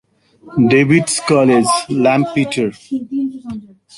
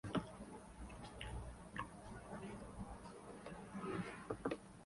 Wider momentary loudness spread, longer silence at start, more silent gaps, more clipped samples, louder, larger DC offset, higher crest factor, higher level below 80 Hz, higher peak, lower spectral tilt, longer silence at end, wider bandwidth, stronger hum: first, 13 LU vs 10 LU; first, 0.45 s vs 0.05 s; neither; neither; first, -15 LUFS vs -50 LUFS; neither; second, 14 dB vs 22 dB; first, -54 dBFS vs -60 dBFS; first, -2 dBFS vs -26 dBFS; about the same, -5 dB/octave vs -6 dB/octave; first, 0.35 s vs 0 s; about the same, 11.5 kHz vs 11.5 kHz; neither